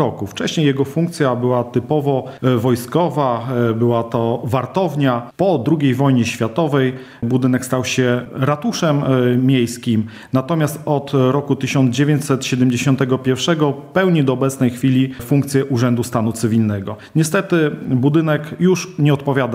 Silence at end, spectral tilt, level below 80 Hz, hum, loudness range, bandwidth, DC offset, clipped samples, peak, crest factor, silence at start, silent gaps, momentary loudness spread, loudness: 0 s; -6.5 dB/octave; -56 dBFS; none; 1 LU; 16 kHz; under 0.1%; under 0.1%; 0 dBFS; 16 dB; 0 s; none; 4 LU; -17 LUFS